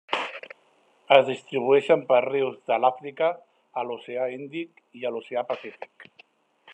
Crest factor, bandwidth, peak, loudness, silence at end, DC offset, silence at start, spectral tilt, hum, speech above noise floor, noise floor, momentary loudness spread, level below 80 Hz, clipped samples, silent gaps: 24 dB; 9 kHz; -2 dBFS; -25 LUFS; 0 s; under 0.1%; 0.1 s; -5.5 dB/octave; none; 38 dB; -63 dBFS; 21 LU; -84 dBFS; under 0.1%; none